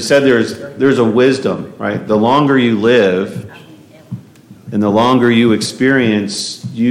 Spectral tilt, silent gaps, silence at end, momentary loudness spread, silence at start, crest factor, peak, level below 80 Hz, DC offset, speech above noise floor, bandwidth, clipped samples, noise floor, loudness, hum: -5.5 dB/octave; none; 0 s; 12 LU; 0 s; 12 dB; 0 dBFS; -56 dBFS; under 0.1%; 27 dB; 14.5 kHz; under 0.1%; -39 dBFS; -13 LUFS; none